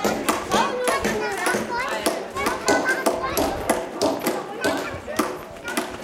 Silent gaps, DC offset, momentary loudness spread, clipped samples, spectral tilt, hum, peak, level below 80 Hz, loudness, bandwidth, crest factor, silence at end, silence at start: none; under 0.1%; 7 LU; under 0.1%; -3 dB/octave; none; -2 dBFS; -48 dBFS; -24 LUFS; 17 kHz; 22 dB; 0 s; 0 s